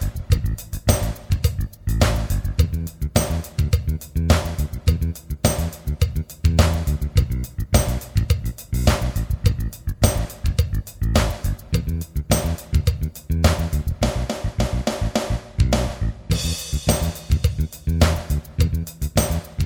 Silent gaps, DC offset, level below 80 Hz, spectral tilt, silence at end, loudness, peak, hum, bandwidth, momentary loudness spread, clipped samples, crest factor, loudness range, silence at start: none; under 0.1%; -24 dBFS; -5.5 dB/octave; 0 s; -22 LUFS; 0 dBFS; none; over 20 kHz; 6 LU; under 0.1%; 20 dB; 2 LU; 0 s